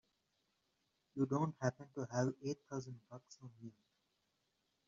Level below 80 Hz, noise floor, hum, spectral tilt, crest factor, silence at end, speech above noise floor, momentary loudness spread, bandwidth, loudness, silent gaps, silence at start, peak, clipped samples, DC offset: -80 dBFS; -84 dBFS; none; -7.5 dB/octave; 22 dB; 1.2 s; 42 dB; 20 LU; 7.4 kHz; -41 LUFS; none; 1.15 s; -22 dBFS; under 0.1%; under 0.1%